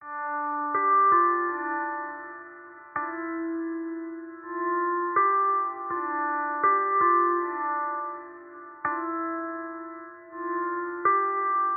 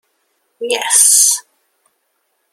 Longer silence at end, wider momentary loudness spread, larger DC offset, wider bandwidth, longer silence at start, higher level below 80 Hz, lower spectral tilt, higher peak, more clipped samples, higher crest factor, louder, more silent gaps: second, 0 s vs 1.1 s; first, 18 LU vs 13 LU; neither; second, 2.7 kHz vs over 20 kHz; second, 0 s vs 0.6 s; about the same, -74 dBFS vs -74 dBFS; about the same, 3.5 dB/octave vs 3.5 dB/octave; second, -10 dBFS vs 0 dBFS; neither; about the same, 16 dB vs 16 dB; second, -26 LUFS vs -10 LUFS; neither